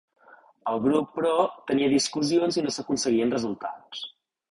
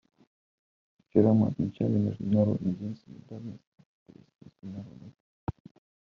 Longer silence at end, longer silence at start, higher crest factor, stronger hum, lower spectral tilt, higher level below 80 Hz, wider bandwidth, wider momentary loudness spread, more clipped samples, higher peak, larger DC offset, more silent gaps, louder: about the same, 0.45 s vs 0.5 s; second, 0.65 s vs 1.15 s; second, 16 dB vs 22 dB; neither; second, -4 dB/octave vs -11 dB/octave; about the same, -64 dBFS vs -60 dBFS; first, 11.5 kHz vs 6.2 kHz; second, 13 LU vs 21 LU; neither; about the same, -10 dBFS vs -8 dBFS; neither; second, none vs 3.67-3.72 s, 3.86-4.06 s, 5.20-5.47 s; first, -25 LUFS vs -28 LUFS